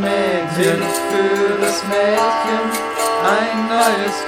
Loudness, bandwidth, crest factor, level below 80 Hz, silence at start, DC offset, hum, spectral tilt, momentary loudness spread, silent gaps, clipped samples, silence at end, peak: -17 LUFS; 17 kHz; 16 dB; -58 dBFS; 0 s; under 0.1%; none; -3.5 dB/octave; 3 LU; none; under 0.1%; 0 s; -2 dBFS